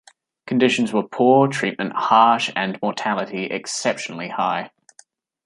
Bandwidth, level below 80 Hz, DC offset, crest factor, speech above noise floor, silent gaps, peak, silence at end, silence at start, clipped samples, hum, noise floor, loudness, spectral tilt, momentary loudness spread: 11.5 kHz; -70 dBFS; under 0.1%; 18 dB; 35 dB; none; -2 dBFS; 0.8 s; 0.45 s; under 0.1%; none; -54 dBFS; -20 LUFS; -4.5 dB/octave; 11 LU